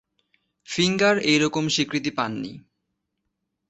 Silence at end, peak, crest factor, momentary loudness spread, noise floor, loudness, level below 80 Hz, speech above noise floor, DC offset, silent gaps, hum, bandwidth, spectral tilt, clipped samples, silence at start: 1.1 s; -6 dBFS; 20 dB; 12 LU; -78 dBFS; -22 LUFS; -62 dBFS; 56 dB; under 0.1%; none; none; 8.2 kHz; -4 dB/octave; under 0.1%; 0.7 s